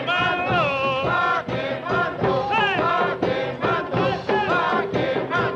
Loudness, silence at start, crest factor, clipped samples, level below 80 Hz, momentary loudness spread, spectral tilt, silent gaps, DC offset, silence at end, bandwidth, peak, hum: -22 LUFS; 0 s; 12 dB; under 0.1%; -50 dBFS; 4 LU; -6.5 dB/octave; none; under 0.1%; 0 s; 8.8 kHz; -10 dBFS; none